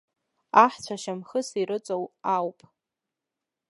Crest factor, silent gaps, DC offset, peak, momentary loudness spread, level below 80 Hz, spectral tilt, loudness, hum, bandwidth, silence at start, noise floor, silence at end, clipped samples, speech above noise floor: 24 dB; none; under 0.1%; -2 dBFS; 14 LU; -80 dBFS; -4.5 dB/octave; -26 LUFS; none; 11.5 kHz; 0.55 s; -87 dBFS; 1.2 s; under 0.1%; 62 dB